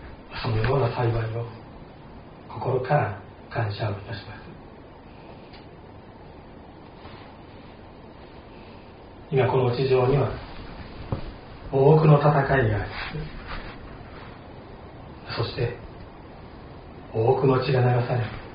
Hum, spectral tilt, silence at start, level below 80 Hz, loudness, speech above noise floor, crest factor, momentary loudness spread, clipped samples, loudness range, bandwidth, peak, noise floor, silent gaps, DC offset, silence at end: none; -6.5 dB/octave; 0 s; -44 dBFS; -24 LUFS; 23 dB; 22 dB; 24 LU; under 0.1%; 22 LU; 5.2 kHz; -4 dBFS; -45 dBFS; none; under 0.1%; 0 s